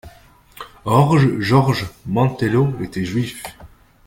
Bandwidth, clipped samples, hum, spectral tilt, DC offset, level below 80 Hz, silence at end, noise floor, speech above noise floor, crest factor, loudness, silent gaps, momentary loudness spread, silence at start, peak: 16.5 kHz; under 0.1%; none; -7 dB/octave; under 0.1%; -46 dBFS; 0.4 s; -47 dBFS; 30 dB; 18 dB; -18 LUFS; none; 18 LU; 0.05 s; -2 dBFS